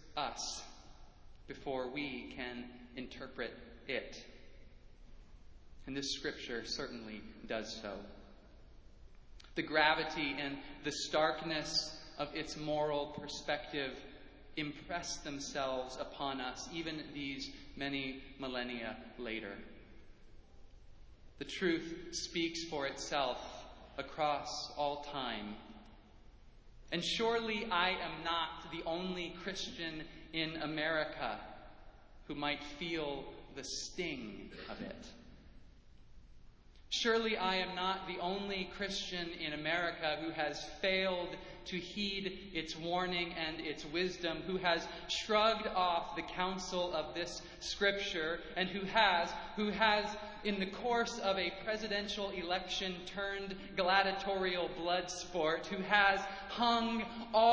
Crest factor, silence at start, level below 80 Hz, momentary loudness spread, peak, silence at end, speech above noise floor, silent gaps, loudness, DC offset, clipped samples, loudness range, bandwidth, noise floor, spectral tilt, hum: 26 dB; 0 s; -60 dBFS; 14 LU; -14 dBFS; 0 s; 21 dB; none; -37 LUFS; under 0.1%; under 0.1%; 10 LU; 8 kHz; -58 dBFS; -3.5 dB/octave; none